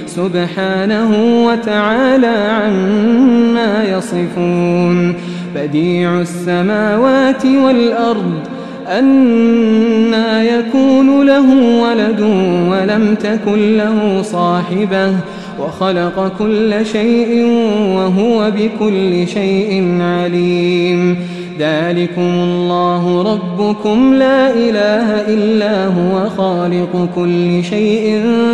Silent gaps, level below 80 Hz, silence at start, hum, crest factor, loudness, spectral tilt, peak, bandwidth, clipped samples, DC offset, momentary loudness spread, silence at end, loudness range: none; -50 dBFS; 0 s; none; 12 dB; -12 LUFS; -7 dB/octave; 0 dBFS; 10.5 kHz; under 0.1%; 0.3%; 7 LU; 0 s; 4 LU